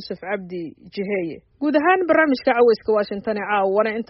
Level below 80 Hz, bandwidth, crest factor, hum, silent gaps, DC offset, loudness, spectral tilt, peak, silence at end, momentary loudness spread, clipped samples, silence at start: -60 dBFS; 5.8 kHz; 16 dB; none; none; under 0.1%; -20 LUFS; -3.5 dB/octave; -6 dBFS; 0.05 s; 14 LU; under 0.1%; 0 s